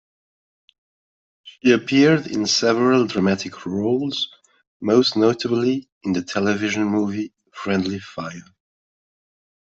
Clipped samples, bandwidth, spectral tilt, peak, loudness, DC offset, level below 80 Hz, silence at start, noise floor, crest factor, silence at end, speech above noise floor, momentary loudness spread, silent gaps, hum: under 0.1%; 8 kHz; -5 dB/octave; -4 dBFS; -20 LUFS; under 0.1%; -64 dBFS; 1.45 s; under -90 dBFS; 18 dB; 1.25 s; over 71 dB; 13 LU; 4.67-4.80 s, 5.92-6.01 s; none